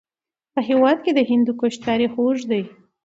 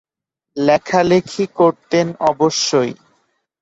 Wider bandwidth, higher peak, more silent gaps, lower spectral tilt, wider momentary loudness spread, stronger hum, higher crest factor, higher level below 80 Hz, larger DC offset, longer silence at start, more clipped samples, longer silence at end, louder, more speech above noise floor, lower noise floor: about the same, 7.8 kHz vs 8 kHz; about the same, -4 dBFS vs -2 dBFS; neither; about the same, -5.5 dB/octave vs -4.5 dB/octave; about the same, 9 LU vs 7 LU; neither; about the same, 16 dB vs 16 dB; second, -62 dBFS vs -56 dBFS; neither; about the same, 0.55 s vs 0.55 s; neither; second, 0.35 s vs 0.7 s; second, -20 LUFS vs -16 LUFS; first, over 71 dB vs 66 dB; first, under -90 dBFS vs -82 dBFS